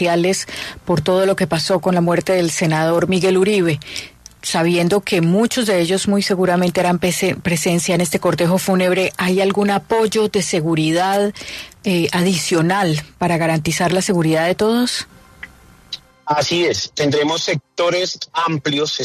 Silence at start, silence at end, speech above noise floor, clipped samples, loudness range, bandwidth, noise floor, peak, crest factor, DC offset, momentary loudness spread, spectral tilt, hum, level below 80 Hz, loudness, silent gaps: 0 s; 0 s; 23 dB; under 0.1%; 3 LU; 13.5 kHz; -40 dBFS; -4 dBFS; 14 dB; under 0.1%; 9 LU; -4.5 dB/octave; none; -50 dBFS; -17 LUFS; none